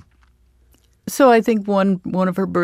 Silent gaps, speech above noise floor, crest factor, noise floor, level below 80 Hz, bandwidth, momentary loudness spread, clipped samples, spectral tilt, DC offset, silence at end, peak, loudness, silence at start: none; 40 dB; 16 dB; -56 dBFS; -56 dBFS; 15.5 kHz; 11 LU; under 0.1%; -6.5 dB/octave; under 0.1%; 0 s; -2 dBFS; -17 LUFS; 1.05 s